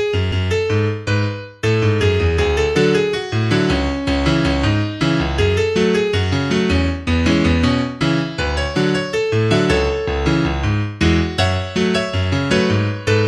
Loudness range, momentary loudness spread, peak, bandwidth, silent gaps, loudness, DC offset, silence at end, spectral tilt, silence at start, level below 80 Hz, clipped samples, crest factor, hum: 1 LU; 4 LU; -2 dBFS; 11.5 kHz; none; -17 LUFS; under 0.1%; 0 s; -6 dB/octave; 0 s; -28 dBFS; under 0.1%; 16 dB; none